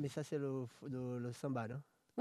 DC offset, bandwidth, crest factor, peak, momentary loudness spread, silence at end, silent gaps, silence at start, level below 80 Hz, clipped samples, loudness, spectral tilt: under 0.1%; 13.5 kHz; 18 dB; -26 dBFS; 7 LU; 0 s; none; 0 s; -80 dBFS; under 0.1%; -44 LUFS; -7 dB/octave